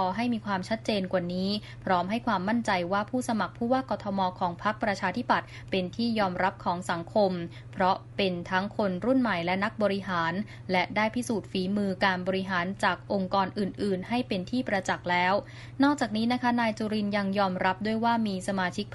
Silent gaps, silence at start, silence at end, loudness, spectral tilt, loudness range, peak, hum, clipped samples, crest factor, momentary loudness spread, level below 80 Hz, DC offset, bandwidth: none; 0 s; 0 s; -28 LUFS; -5.5 dB/octave; 2 LU; -10 dBFS; none; under 0.1%; 18 dB; 5 LU; -58 dBFS; under 0.1%; 11.5 kHz